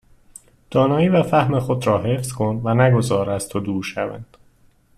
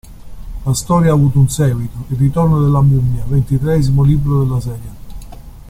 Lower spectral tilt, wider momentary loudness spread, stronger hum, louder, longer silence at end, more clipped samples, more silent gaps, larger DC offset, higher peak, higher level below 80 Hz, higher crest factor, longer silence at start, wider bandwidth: about the same, -6.5 dB/octave vs -7.5 dB/octave; second, 9 LU vs 12 LU; neither; second, -19 LUFS vs -14 LUFS; first, 0.75 s vs 0 s; neither; neither; neither; about the same, -4 dBFS vs -2 dBFS; second, -50 dBFS vs -28 dBFS; about the same, 16 dB vs 12 dB; first, 0.7 s vs 0.05 s; second, 13.5 kHz vs 15 kHz